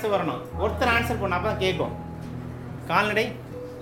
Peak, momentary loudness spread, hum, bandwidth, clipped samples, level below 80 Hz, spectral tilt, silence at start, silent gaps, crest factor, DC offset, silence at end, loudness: -6 dBFS; 14 LU; none; 16.5 kHz; under 0.1%; -46 dBFS; -5.5 dB/octave; 0 s; none; 20 dB; under 0.1%; 0 s; -25 LUFS